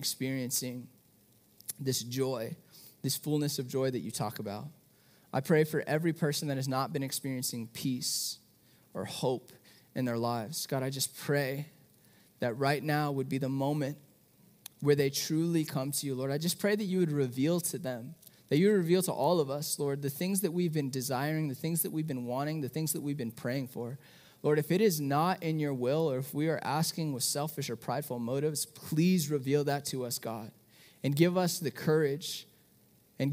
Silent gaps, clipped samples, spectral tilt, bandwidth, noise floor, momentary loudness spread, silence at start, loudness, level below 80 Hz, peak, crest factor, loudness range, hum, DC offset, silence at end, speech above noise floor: none; under 0.1%; -5 dB/octave; 16 kHz; -65 dBFS; 12 LU; 0 s; -32 LUFS; -78 dBFS; -12 dBFS; 20 dB; 5 LU; none; under 0.1%; 0 s; 33 dB